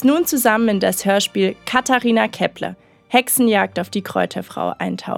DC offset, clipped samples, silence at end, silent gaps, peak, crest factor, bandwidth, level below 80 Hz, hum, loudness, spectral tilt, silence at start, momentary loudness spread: under 0.1%; under 0.1%; 0 s; none; 0 dBFS; 18 dB; 19 kHz; -58 dBFS; none; -18 LUFS; -3.5 dB/octave; 0 s; 9 LU